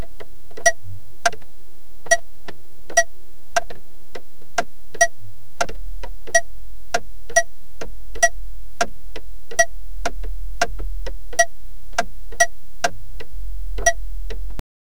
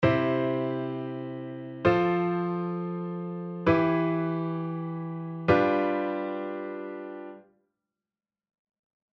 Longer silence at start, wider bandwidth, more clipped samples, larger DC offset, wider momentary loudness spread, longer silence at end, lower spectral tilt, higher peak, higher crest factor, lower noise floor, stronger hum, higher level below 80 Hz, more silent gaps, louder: about the same, 0 s vs 0 s; first, over 20 kHz vs 6.2 kHz; neither; first, 10% vs under 0.1%; first, 22 LU vs 14 LU; second, 0.4 s vs 1.75 s; second, -1.5 dB/octave vs -9 dB/octave; first, 0 dBFS vs -8 dBFS; about the same, 24 dB vs 20 dB; second, -49 dBFS vs under -90 dBFS; neither; first, -36 dBFS vs -58 dBFS; neither; first, -23 LUFS vs -28 LUFS